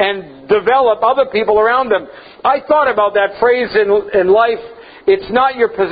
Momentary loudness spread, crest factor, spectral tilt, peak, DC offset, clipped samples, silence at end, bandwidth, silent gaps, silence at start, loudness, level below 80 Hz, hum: 6 LU; 12 dB; -8 dB/octave; 0 dBFS; under 0.1%; under 0.1%; 0 s; 5 kHz; none; 0 s; -13 LUFS; -50 dBFS; none